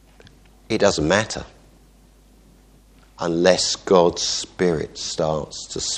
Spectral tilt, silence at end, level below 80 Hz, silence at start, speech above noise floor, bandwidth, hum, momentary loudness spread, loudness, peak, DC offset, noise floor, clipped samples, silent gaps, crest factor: -3.5 dB/octave; 0 s; -46 dBFS; 0.7 s; 31 dB; 10.5 kHz; none; 11 LU; -20 LUFS; 0 dBFS; under 0.1%; -52 dBFS; under 0.1%; none; 22 dB